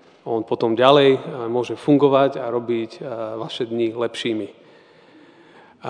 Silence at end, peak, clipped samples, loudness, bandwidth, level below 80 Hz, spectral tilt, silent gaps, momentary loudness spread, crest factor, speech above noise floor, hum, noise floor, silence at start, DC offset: 0 s; 0 dBFS; under 0.1%; -20 LUFS; 10 kHz; -72 dBFS; -6.5 dB/octave; none; 14 LU; 20 dB; 30 dB; none; -50 dBFS; 0.25 s; under 0.1%